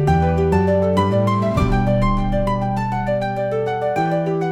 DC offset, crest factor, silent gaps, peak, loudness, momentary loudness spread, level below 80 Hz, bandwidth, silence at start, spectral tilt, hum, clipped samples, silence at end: 0.2%; 14 dB; none; -4 dBFS; -19 LUFS; 4 LU; -28 dBFS; 12.5 kHz; 0 s; -8 dB/octave; none; under 0.1%; 0 s